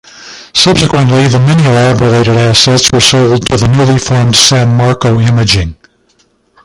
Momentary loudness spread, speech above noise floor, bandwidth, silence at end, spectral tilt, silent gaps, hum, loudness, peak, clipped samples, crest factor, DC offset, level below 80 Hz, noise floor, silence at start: 4 LU; 45 dB; 16 kHz; 0.9 s; -4.5 dB/octave; none; none; -7 LUFS; 0 dBFS; 0.3%; 8 dB; under 0.1%; -30 dBFS; -52 dBFS; 0.15 s